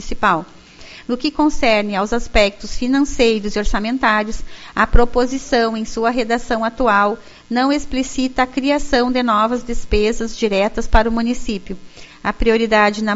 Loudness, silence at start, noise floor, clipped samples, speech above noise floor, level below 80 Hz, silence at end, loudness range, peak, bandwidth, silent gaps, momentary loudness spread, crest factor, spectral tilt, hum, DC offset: -17 LUFS; 0 s; -39 dBFS; under 0.1%; 23 dB; -26 dBFS; 0 s; 1 LU; 0 dBFS; 8 kHz; none; 10 LU; 16 dB; -3 dB/octave; none; under 0.1%